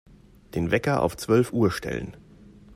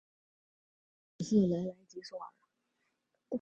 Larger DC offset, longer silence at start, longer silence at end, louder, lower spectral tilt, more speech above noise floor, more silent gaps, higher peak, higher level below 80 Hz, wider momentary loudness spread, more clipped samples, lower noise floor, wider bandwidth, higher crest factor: neither; second, 0.55 s vs 1.2 s; about the same, 0 s vs 0.05 s; first, -25 LUFS vs -33 LUFS; about the same, -6.5 dB/octave vs -7.5 dB/octave; second, 26 dB vs 49 dB; neither; first, -8 dBFS vs -16 dBFS; first, -50 dBFS vs -70 dBFS; second, 12 LU vs 19 LU; neither; second, -50 dBFS vs -82 dBFS; first, 16 kHz vs 8 kHz; about the same, 18 dB vs 20 dB